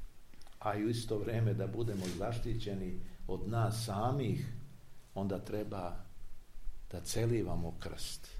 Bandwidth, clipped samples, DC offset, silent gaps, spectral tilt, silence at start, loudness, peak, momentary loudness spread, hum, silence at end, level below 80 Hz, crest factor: 15.5 kHz; under 0.1%; under 0.1%; none; -6 dB/octave; 0 s; -38 LUFS; -20 dBFS; 16 LU; none; 0 s; -48 dBFS; 16 dB